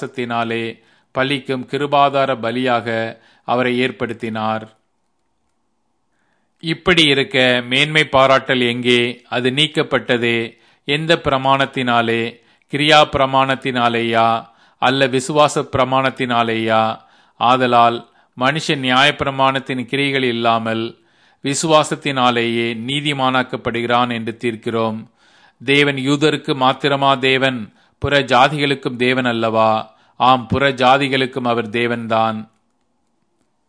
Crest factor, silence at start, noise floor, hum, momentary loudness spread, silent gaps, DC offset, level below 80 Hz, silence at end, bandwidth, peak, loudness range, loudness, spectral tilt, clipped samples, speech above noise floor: 18 dB; 0 s; -69 dBFS; none; 10 LU; none; under 0.1%; -50 dBFS; 1.25 s; 11 kHz; 0 dBFS; 4 LU; -16 LUFS; -4.5 dB/octave; under 0.1%; 53 dB